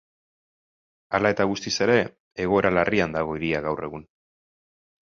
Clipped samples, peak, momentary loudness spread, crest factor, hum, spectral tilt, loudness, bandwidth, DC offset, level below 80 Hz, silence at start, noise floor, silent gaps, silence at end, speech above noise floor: under 0.1%; -4 dBFS; 10 LU; 22 dB; none; -5 dB/octave; -24 LUFS; 7.4 kHz; under 0.1%; -52 dBFS; 1.1 s; under -90 dBFS; 2.20-2.31 s; 1 s; over 67 dB